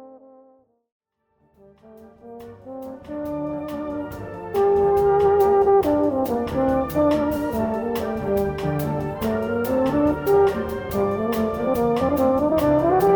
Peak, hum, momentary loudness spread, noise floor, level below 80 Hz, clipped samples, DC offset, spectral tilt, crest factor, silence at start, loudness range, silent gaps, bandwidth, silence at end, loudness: -8 dBFS; none; 14 LU; -66 dBFS; -44 dBFS; under 0.1%; under 0.1%; -7.5 dB/octave; 14 dB; 0 s; 14 LU; 0.92-1.00 s; over 20 kHz; 0 s; -21 LUFS